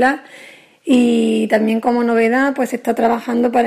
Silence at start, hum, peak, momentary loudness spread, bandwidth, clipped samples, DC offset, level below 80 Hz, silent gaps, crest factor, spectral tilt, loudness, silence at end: 0 s; none; -2 dBFS; 6 LU; 15 kHz; under 0.1%; under 0.1%; -60 dBFS; none; 14 dB; -5.5 dB/octave; -16 LUFS; 0 s